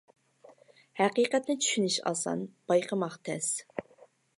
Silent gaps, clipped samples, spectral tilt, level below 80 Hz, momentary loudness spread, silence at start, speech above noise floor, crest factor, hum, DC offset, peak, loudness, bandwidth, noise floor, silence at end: none; under 0.1%; -3 dB/octave; -82 dBFS; 10 LU; 0.5 s; 31 dB; 20 dB; none; under 0.1%; -12 dBFS; -30 LUFS; 11.5 kHz; -60 dBFS; 0.55 s